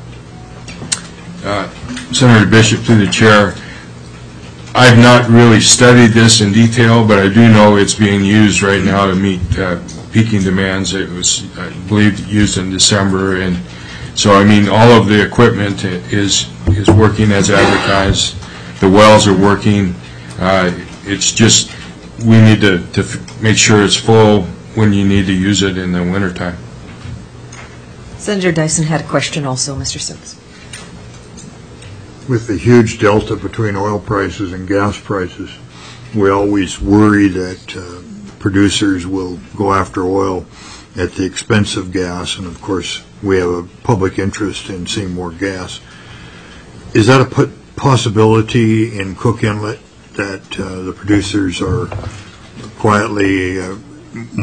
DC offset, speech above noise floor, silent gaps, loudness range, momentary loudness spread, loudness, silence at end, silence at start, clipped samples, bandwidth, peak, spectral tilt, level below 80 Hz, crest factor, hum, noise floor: under 0.1%; 24 dB; none; 10 LU; 21 LU; -11 LUFS; 0 s; 0 s; 0.1%; 11 kHz; 0 dBFS; -5 dB/octave; -36 dBFS; 12 dB; none; -35 dBFS